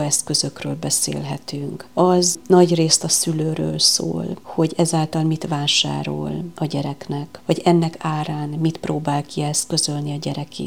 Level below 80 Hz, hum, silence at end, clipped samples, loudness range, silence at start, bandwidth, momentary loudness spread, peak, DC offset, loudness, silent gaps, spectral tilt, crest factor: -60 dBFS; none; 0 s; under 0.1%; 5 LU; 0 s; 17 kHz; 12 LU; 0 dBFS; 0.4%; -20 LUFS; none; -4 dB/octave; 20 dB